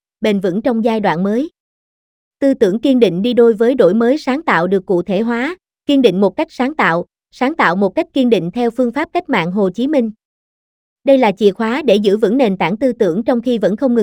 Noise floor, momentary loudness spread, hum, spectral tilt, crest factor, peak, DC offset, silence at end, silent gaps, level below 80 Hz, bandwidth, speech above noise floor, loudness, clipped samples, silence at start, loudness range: under -90 dBFS; 7 LU; none; -7 dB/octave; 14 dB; 0 dBFS; under 0.1%; 0 s; 1.60-2.31 s, 10.25-10.96 s; -54 dBFS; 14 kHz; over 76 dB; -15 LUFS; under 0.1%; 0.2 s; 3 LU